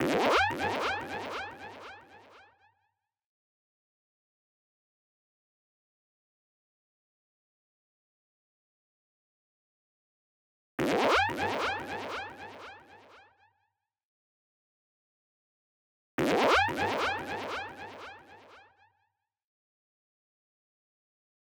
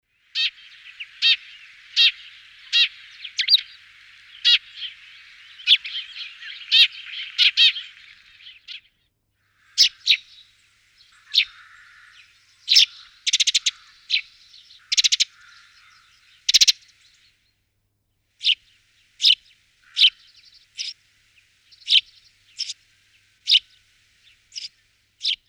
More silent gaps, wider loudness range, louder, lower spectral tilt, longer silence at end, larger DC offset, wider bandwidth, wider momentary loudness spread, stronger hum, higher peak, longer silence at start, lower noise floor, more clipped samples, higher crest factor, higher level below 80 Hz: first, 3.26-10.78 s, 14.05-16.18 s vs none; first, 18 LU vs 4 LU; second, -30 LUFS vs -18 LUFS; first, -4 dB/octave vs 6.5 dB/octave; first, 2.95 s vs 0.15 s; neither; about the same, over 20 kHz vs 20 kHz; about the same, 21 LU vs 21 LU; neither; second, -12 dBFS vs -2 dBFS; second, 0 s vs 0.35 s; first, -80 dBFS vs -71 dBFS; neither; about the same, 24 dB vs 22 dB; first, -62 dBFS vs -72 dBFS